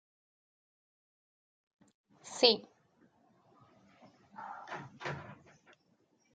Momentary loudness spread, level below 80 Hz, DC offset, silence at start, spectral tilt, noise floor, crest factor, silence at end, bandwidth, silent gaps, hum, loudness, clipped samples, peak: 27 LU; -84 dBFS; under 0.1%; 2.25 s; -3 dB/octave; -73 dBFS; 32 dB; 1 s; 9 kHz; none; none; -32 LUFS; under 0.1%; -8 dBFS